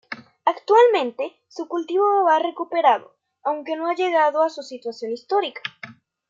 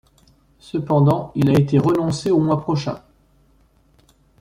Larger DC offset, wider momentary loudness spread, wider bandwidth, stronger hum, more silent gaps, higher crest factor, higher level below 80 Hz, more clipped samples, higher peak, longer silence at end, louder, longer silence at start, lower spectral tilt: neither; first, 16 LU vs 12 LU; second, 7.6 kHz vs 12 kHz; neither; neither; about the same, 18 dB vs 16 dB; second, -82 dBFS vs -50 dBFS; neither; about the same, -4 dBFS vs -4 dBFS; second, 0.35 s vs 1.45 s; about the same, -21 LUFS vs -19 LUFS; second, 0.1 s vs 0.65 s; second, -3.5 dB/octave vs -8 dB/octave